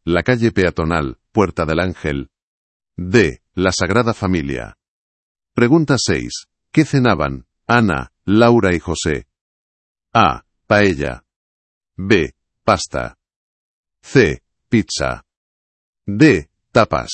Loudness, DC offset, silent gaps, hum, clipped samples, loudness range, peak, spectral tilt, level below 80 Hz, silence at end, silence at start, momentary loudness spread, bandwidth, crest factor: -17 LUFS; under 0.1%; 2.42-2.80 s, 4.88-5.35 s, 9.41-9.95 s, 11.36-11.81 s, 13.36-13.84 s, 15.37-15.93 s; none; under 0.1%; 3 LU; 0 dBFS; -5.5 dB/octave; -40 dBFS; 0 s; 0.05 s; 14 LU; 8.8 kHz; 18 dB